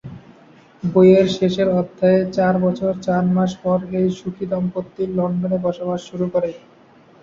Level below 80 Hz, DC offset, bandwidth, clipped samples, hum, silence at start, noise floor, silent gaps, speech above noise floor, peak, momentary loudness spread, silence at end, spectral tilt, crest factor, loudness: -54 dBFS; under 0.1%; 7.4 kHz; under 0.1%; none; 0.05 s; -49 dBFS; none; 31 dB; -2 dBFS; 11 LU; 0.65 s; -8 dB/octave; 18 dB; -19 LUFS